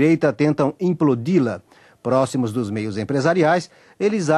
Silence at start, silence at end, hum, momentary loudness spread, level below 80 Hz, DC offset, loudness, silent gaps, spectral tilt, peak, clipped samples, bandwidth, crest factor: 0 s; 0 s; none; 8 LU; -62 dBFS; under 0.1%; -20 LUFS; none; -7 dB/octave; -4 dBFS; under 0.1%; 12.5 kHz; 14 dB